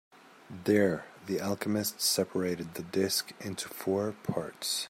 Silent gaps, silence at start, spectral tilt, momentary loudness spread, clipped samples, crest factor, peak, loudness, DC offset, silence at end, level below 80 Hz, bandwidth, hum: none; 0.5 s; -4 dB/octave; 11 LU; under 0.1%; 20 dB; -12 dBFS; -31 LUFS; under 0.1%; 0 s; -72 dBFS; 16 kHz; none